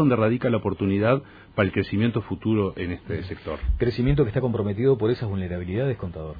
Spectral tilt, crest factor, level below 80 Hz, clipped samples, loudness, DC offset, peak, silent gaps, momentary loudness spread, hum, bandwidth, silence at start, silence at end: -10.5 dB/octave; 16 dB; -38 dBFS; under 0.1%; -25 LUFS; under 0.1%; -6 dBFS; none; 10 LU; none; 5 kHz; 0 s; 0 s